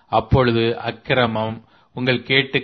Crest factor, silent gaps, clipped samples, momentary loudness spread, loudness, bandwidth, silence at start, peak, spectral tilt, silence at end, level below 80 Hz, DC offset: 18 dB; none; under 0.1%; 11 LU; -19 LUFS; 5.8 kHz; 0.1 s; -2 dBFS; -8.5 dB/octave; 0 s; -38 dBFS; under 0.1%